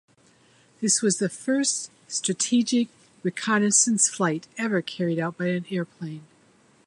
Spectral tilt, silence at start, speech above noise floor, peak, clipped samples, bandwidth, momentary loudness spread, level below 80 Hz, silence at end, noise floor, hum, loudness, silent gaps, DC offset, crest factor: -3.5 dB/octave; 0.8 s; 34 dB; -6 dBFS; under 0.1%; 11.5 kHz; 12 LU; -74 dBFS; 0.65 s; -59 dBFS; none; -24 LUFS; none; under 0.1%; 20 dB